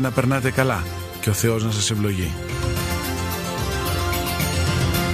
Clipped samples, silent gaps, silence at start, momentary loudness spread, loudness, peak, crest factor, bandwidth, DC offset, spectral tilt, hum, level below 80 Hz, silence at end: under 0.1%; none; 0 s; 6 LU; -22 LUFS; -2 dBFS; 20 dB; 15.5 kHz; under 0.1%; -4.5 dB/octave; none; -34 dBFS; 0 s